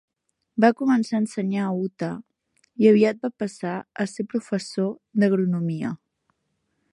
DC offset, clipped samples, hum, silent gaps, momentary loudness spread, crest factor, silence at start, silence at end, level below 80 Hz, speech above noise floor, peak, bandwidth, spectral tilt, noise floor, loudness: under 0.1%; under 0.1%; none; none; 13 LU; 20 dB; 0.55 s; 0.95 s; -72 dBFS; 52 dB; -4 dBFS; 11 kHz; -7 dB/octave; -74 dBFS; -23 LUFS